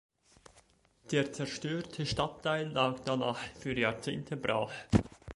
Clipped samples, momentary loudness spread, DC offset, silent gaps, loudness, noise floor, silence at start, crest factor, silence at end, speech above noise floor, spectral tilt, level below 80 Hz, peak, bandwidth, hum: under 0.1%; 6 LU; under 0.1%; none; -34 LUFS; -66 dBFS; 0.55 s; 26 dB; 0 s; 32 dB; -5.5 dB/octave; -54 dBFS; -10 dBFS; 11.5 kHz; none